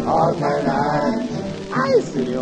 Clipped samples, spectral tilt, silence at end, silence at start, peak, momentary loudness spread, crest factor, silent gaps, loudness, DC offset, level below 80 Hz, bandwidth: under 0.1%; -6.5 dB/octave; 0 s; 0 s; -4 dBFS; 7 LU; 14 dB; none; -20 LUFS; under 0.1%; -46 dBFS; 9.8 kHz